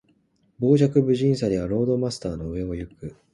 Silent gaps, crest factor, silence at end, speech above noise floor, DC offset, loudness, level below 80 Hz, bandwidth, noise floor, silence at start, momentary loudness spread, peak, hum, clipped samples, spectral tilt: none; 18 dB; 0.2 s; 42 dB; under 0.1%; -23 LUFS; -46 dBFS; 11.5 kHz; -64 dBFS; 0.6 s; 14 LU; -6 dBFS; none; under 0.1%; -8 dB/octave